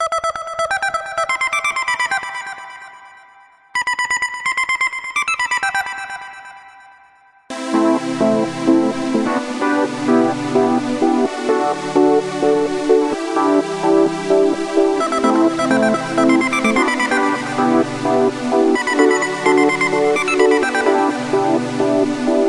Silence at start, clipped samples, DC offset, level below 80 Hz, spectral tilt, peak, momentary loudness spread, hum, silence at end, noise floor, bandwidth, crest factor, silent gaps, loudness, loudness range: 0 s; under 0.1%; under 0.1%; -56 dBFS; -4.5 dB/octave; 0 dBFS; 6 LU; none; 0 s; -50 dBFS; 12 kHz; 16 dB; none; -17 LUFS; 5 LU